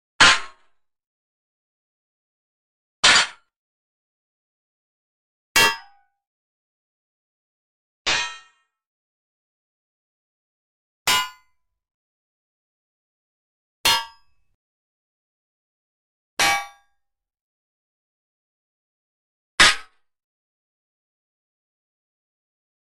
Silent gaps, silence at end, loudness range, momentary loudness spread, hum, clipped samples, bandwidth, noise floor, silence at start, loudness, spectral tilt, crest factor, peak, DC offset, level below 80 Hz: 1.07-3.03 s, 3.56-5.55 s, 6.27-8.05 s, 8.86-11.05 s, 11.94-13.84 s, 14.54-16.37 s, 17.41-19.58 s; 3.15 s; 8 LU; 17 LU; none; under 0.1%; 15 kHz; -71 dBFS; 0.2 s; -18 LUFS; 0.5 dB/octave; 22 dB; -4 dBFS; under 0.1%; -54 dBFS